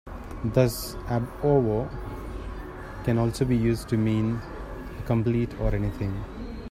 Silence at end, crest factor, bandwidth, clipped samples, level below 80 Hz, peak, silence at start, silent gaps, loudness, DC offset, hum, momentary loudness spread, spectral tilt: 0.05 s; 20 dB; 15.5 kHz; under 0.1%; -38 dBFS; -6 dBFS; 0.05 s; none; -27 LUFS; under 0.1%; none; 15 LU; -7.5 dB/octave